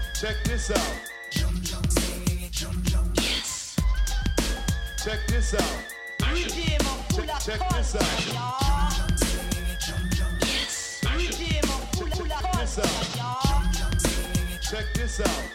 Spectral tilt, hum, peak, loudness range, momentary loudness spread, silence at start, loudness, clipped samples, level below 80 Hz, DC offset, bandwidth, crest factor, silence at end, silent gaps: -4 dB/octave; none; -6 dBFS; 1 LU; 4 LU; 0 s; -27 LUFS; under 0.1%; -28 dBFS; under 0.1%; 16.5 kHz; 18 dB; 0 s; none